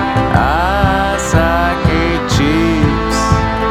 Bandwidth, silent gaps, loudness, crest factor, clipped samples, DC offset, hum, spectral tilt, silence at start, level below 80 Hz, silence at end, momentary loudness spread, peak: 15.5 kHz; none; -13 LUFS; 12 dB; under 0.1%; under 0.1%; none; -5.5 dB/octave; 0 s; -22 dBFS; 0 s; 2 LU; 0 dBFS